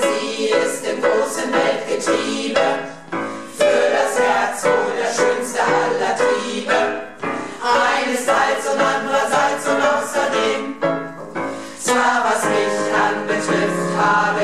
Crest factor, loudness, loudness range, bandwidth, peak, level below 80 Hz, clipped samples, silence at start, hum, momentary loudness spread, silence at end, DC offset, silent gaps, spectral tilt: 14 dB; -18 LUFS; 2 LU; 14 kHz; -4 dBFS; -60 dBFS; under 0.1%; 0 s; none; 9 LU; 0 s; 0.5%; none; -3 dB/octave